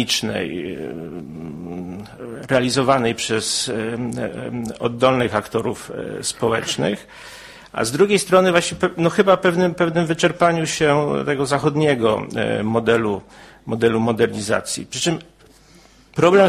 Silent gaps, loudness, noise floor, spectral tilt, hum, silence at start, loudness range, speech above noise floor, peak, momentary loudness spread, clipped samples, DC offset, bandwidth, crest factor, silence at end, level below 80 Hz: none; -19 LUFS; -49 dBFS; -4.5 dB/octave; none; 0 s; 5 LU; 30 dB; 0 dBFS; 15 LU; under 0.1%; under 0.1%; 15.5 kHz; 18 dB; 0 s; -50 dBFS